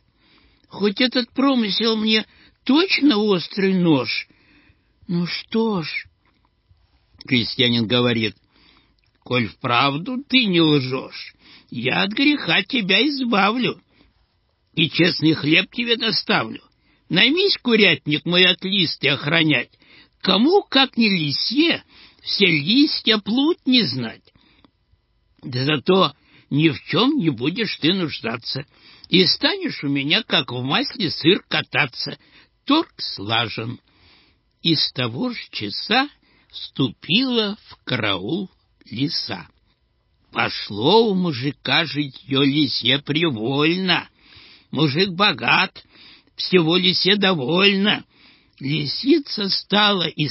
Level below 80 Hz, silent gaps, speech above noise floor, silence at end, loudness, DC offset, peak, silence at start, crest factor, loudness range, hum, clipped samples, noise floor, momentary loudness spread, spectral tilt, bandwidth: -60 dBFS; none; 46 dB; 0 s; -19 LUFS; under 0.1%; -2 dBFS; 0.75 s; 20 dB; 6 LU; none; under 0.1%; -65 dBFS; 12 LU; -8.5 dB/octave; 5.8 kHz